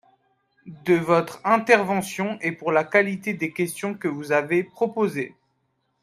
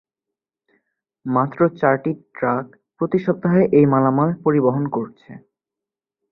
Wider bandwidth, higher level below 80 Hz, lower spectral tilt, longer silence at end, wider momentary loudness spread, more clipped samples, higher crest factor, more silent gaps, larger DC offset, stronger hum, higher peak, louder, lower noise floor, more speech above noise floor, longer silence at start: first, 15 kHz vs 5.2 kHz; second, -68 dBFS vs -60 dBFS; second, -5.5 dB/octave vs -11.5 dB/octave; second, 0.75 s vs 0.95 s; second, 9 LU vs 12 LU; neither; about the same, 22 dB vs 18 dB; neither; neither; neither; about the same, -2 dBFS vs -2 dBFS; second, -23 LUFS vs -19 LUFS; second, -72 dBFS vs -87 dBFS; second, 49 dB vs 69 dB; second, 0.65 s vs 1.25 s